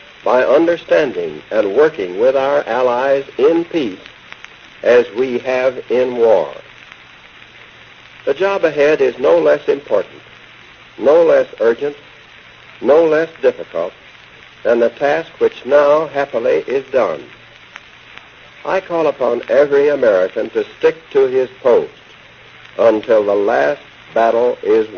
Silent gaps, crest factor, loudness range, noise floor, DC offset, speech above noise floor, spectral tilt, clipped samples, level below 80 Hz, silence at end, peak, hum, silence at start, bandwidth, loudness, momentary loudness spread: none; 16 dB; 3 LU; -41 dBFS; under 0.1%; 27 dB; -3 dB/octave; under 0.1%; -58 dBFS; 0 s; 0 dBFS; none; 0.25 s; 6.8 kHz; -15 LUFS; 11 LU